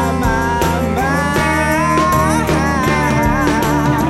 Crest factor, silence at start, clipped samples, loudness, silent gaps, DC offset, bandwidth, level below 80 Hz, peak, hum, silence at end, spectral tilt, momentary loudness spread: 12 dB; 0 s; under 0.1%; -14 LUFS; none; 0.4%; 16.5 kHz; -26 dBFS; -4 dBFS; none; 0 s; -5.5 dB/octave; 3 LU